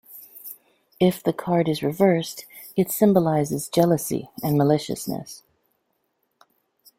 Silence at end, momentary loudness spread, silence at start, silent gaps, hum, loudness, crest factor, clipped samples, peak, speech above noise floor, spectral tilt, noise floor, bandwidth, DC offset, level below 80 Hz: 1.6 s; 19 LU; 0.1 s; none; none; -22 LUFS; 20 dB; under 0.1%; -4 dBFS; 51 dB; -6 dB/octave; -73 dBFS; 16.5 kHz; under 0.1%; -60 dBFS